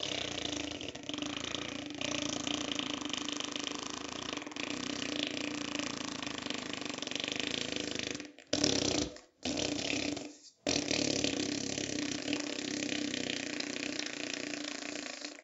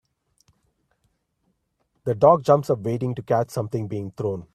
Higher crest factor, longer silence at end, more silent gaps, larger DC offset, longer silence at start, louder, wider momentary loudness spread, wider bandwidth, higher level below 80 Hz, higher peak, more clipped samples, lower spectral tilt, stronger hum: first, 28 dB vs 22 dB; about the same, 0 s vs 0.1 s; neither; neither; second, 0 s vs 2.05 s; second, -36 LUFS vs -22 LUFS; second, 8 LU vs 12 LU; second, 8.4 kHz vs 14 kHz; about the same, -64 dBFS vs -60 dBFS; second, -10 dBFS vs -2 dBFS; neither; second, -2.5 dB/octave vs -8 dB/octave; neither